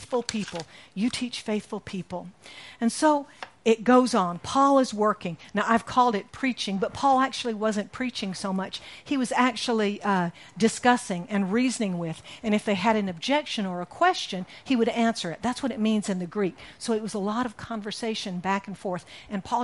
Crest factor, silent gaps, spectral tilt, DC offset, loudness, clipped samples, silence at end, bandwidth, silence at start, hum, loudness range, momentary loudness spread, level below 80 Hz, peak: 20 dB; none; -4.5 dB/octave; under 0.1%; -26 LUFS; under 0.1%; 0 s; 11.5 kHz; 0 s; none; 6 LU; 13 LU; -62 dBFS; -6 dBFS